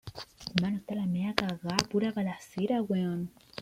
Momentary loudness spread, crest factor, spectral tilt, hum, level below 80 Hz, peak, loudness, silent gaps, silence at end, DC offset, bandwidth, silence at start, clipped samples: 8 LU; 32 dB; -5.5 dB/octave; none; -62 dBFS; 0 dBFS; -32 LUFS; none; 0 s; under 0.1%; 16 kHz; 0.05 s; under 0.1%